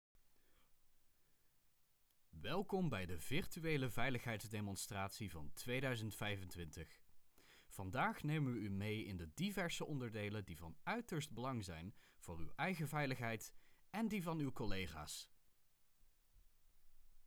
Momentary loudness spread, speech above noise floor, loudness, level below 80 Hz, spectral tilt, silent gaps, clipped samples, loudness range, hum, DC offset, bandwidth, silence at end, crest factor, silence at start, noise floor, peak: 12 LU; 31 dB; -45 LUFS; -62 dBFS; -5 dB/octave; none; under 0.1%; 4 LU; none; under 0.1%; over 20 kHz; 0 s; 20 dB; 0.25 s; -75 dBFS; -26 dBFS